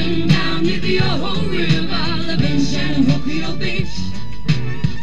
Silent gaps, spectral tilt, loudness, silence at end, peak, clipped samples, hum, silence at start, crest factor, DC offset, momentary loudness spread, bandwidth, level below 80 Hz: none; -6 dB/octave; -19 LUFS; 0 s; -4 dBFS; under 0.1%; none; 0 s; 16 dB; 10%; 6 LU; 9.2 kHz; -34 dBFS